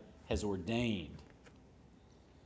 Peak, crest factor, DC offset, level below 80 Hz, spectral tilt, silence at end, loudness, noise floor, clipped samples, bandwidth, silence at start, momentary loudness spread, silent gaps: -20 dBFS; 20 dB; under 0.1%; -54 dBFS; -6 dB/octave; 0.65 s; -38 LUFS; -62 dBFS; under 0.1%; 8 kHz; 0 s; 24 LU; none